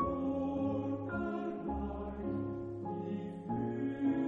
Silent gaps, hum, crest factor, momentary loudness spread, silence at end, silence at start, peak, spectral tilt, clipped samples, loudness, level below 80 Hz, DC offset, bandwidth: none; none; 14 dB; 6 LU; 0 s; 0 s; -22 dBFS; -10 dB/octave; under 0.1%; -38 LUFS; -52 dBFS; under 0.1%; 4 kHz